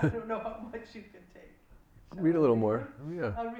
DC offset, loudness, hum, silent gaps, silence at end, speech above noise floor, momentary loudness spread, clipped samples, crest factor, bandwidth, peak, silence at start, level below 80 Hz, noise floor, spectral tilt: under 0.1%; -30 LUFS; none; none; 0 s; 27 dB; 22 LU; under 0.1%; 18 dB; 8 kHz; -14 dBFS; 0 s; -56 dBFS; -58 dBFS; -9.5 dB/octave